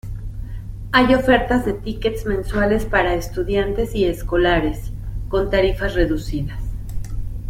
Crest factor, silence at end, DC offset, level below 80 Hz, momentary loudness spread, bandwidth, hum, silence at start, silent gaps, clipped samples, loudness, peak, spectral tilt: 18 dB; 0 s; under 0.1%; -28 dBFS; 15 LU; 16 kHz; none; 0.05 s; none; under 0.1%; -19 LUFS; -2 dBFS; -6.5 dB/octave